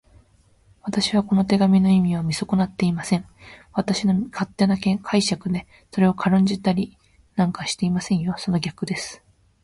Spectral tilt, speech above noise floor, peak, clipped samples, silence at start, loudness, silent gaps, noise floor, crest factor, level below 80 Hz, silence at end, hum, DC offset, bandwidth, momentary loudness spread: -6 dB/octave; 36 dB; -6 dBFS; under 0.1%; 0.85 s; -22 LUFS; none; -57 dBFS; 16 dB; -52 dBFS; 0.5 s; none; under 0.1%; 11.5 kHz; 10 LU